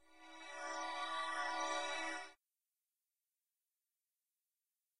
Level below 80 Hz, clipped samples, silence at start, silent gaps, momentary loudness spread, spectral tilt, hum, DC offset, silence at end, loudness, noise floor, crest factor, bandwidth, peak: -90 dBFS; under 0.1%; 0.05 s; none; 14 LU; 0.5 dB/octave; none; under 0.1%; 0 s; -42 LUFS; under -90 dBFS; 20 dB; 15 kHz; -28 dBFS